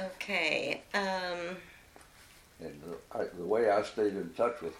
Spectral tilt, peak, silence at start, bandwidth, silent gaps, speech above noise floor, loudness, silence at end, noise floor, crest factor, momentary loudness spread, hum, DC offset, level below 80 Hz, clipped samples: -4 dB/octave; -16 dBFS; 0 s; 16.5 kHz; none; 25 dB; -32 LUFS; 0 s; -58 dBFS; 20 dB; 17 LU; none; under 0.1%; -66 dBFS; under 0.1%